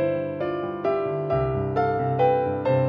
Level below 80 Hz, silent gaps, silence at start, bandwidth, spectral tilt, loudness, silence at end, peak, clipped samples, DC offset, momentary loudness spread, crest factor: -48 dBFS; none; 0 s; 5.4 kHz; -10 dB/octave; -24 LUFS; 0 s; -10 dBFS; under 0.1%; under 0.1%; 6 LU; 14 dB